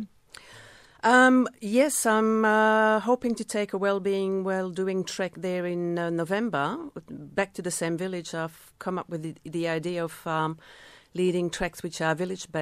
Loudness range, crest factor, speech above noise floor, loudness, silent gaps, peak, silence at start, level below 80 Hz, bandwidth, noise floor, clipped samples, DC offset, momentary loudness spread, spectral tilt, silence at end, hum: 9 LU; 20 dB; 24 dB; -26 LUFS; none; -6 dBFS; 0 s; -60 dBFS; 15.5 kHz; -51 dBFS; under 0.1%; under 0.1%; 14 LU; -4.5 dB/octave; 0 s; none